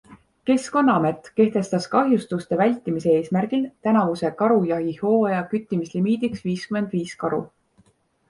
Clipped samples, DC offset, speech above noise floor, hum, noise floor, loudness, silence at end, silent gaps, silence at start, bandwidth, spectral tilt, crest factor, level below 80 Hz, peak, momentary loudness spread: under 0.1%; under 0.1%; 39 dB; none; -61 dBFS; -22 LUFS; 0.85 s; none; 0.1 s; 11.5 kHz; -7 dB/octave; 18 dB; -62 dBFS; -4 dBFS; 7 LU